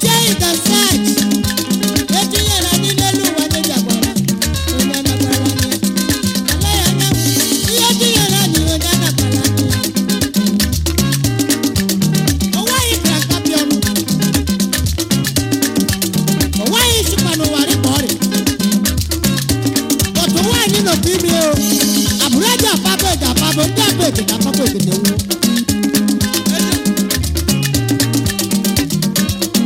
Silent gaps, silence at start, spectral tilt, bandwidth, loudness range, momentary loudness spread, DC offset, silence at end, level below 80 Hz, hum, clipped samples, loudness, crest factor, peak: none; 0 s; -3.5 dB/octave; 16.5 kHz; 2 LU; 4 LU; under 0.1%; 0 s; -30 dBFS; none; under 0.1%; -14 LUFS; 14 dB; 0 dBFS